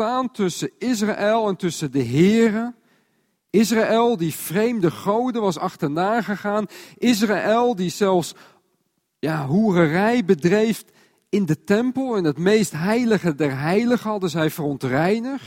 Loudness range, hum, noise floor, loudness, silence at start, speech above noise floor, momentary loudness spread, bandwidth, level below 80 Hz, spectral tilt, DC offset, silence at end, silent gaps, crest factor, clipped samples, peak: 2 LU; none; -70 dBFS; -21 LUFS; 0 s; 51 dB; 7 LU; 16.5 kHz; -60 dBFS; -6 dB/octave; under 0.1%; 0 s; none; 16 dB; under 0.1%; -4 dBFS